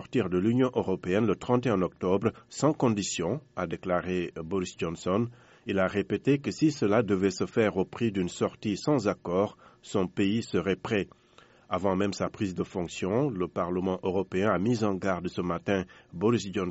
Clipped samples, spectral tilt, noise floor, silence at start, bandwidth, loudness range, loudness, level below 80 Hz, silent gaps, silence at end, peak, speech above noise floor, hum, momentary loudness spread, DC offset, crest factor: under 0.1%; -6 dB/octave; -58 dBFS; 0 s; 8 kHz; 3 LU; -29 LUFS; -60 dBFS; none; 0 s; -10 dBFS; 30 dB; none; 7 LU; under 0.1%; 18 dB